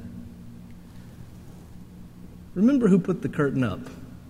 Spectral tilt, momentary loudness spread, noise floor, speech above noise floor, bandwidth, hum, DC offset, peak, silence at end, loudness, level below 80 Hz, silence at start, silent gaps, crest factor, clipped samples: -8.5 dB/octave; 25 LU; -43 dBFS; 21 dB; 12 kHz; none; under 0.1%; -6 dBFS; 0 s; -24 LUFS; -52 dBFS; 0 s; none; 20 dB; under 0.1%